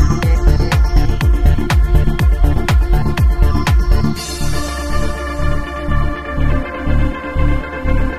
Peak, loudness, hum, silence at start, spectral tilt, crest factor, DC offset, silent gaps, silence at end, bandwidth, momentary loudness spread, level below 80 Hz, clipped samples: 0 dBFS; -17 LUFS; none; 0 s; -6 dB/octave; 12 dB; 6%; none; 0 s; 15.5 kHz; 6 LU; -14 dBFS; under 0.1%